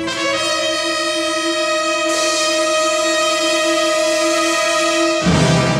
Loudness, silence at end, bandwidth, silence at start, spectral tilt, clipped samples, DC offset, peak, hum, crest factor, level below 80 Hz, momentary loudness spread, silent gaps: -15 LUFS; 0 s; 20 kHz; 0 s; -3 dB/octave; under 0.1%; under 0.1%; -2 dBFS; none; 14 dB; -44 dBFS; 3 LU; none